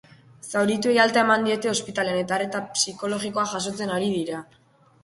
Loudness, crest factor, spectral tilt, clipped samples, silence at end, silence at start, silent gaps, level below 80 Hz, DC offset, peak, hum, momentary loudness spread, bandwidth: -23 LUFS; 20 dB; -3.5 dB/octave; under 0.1%; 0.6 s; 0.45 s; none; -64 dBFS; under 0.1%; -4 dBFS; none; 10 LU; 11.5 kHz